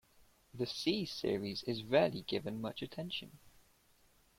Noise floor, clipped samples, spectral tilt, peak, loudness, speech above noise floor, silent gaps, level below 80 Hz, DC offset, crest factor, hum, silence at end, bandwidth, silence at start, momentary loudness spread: -69 dBFS; under 0.1%; -5.5 dB/octave; -18 dBFS; -37 LUFS; 32 dB; none; -68 dBFS; under 0.1%; 22 dB; none; 0.9 s; 16.5 kHz; 0.2 s; 12 LU